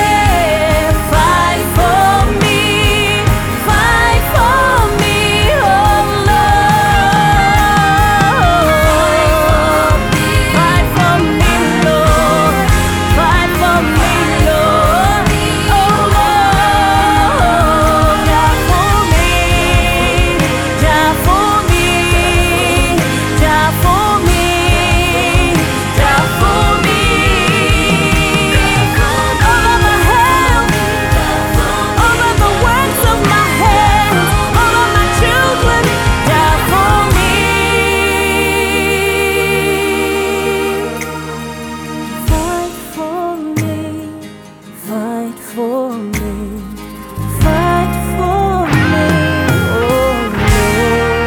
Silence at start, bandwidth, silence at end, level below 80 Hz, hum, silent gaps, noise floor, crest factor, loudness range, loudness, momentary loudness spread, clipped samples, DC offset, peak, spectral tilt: 0 s; over 20 kHz; 0 s; -20 dBFS; none; none; -33 dBFS; 10 dB; 7 LU; -11 LUFS; 9 LU; under 0.1%; under 0.1%; 0 dBFS; -4.5 dB/octave